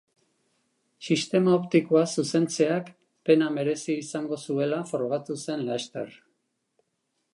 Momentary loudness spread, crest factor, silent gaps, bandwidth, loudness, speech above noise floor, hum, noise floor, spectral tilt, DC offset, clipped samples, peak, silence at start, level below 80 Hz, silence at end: 11 LU; 20 dB; none; 11.5 kHz; -26 LUFS; 52 dB; none; -77 dBFS; -5.5 dB/octave; under 0.1%; under 0.1%; -8 dBFS; 1 s; -78 dBFS; 1.25 s